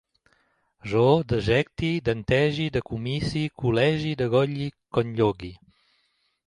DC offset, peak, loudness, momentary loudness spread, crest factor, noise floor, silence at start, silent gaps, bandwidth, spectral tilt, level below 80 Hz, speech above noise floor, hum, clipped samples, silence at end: under 0.1%; -6 dBFS; -24 LUFS; 8 LU; 20 dB; -70 dBFS; 0.85 s; none; 11 kHz; -7 dB/octave; -48 dBFS; 46 dB; none; under 0.1%; 0.9 s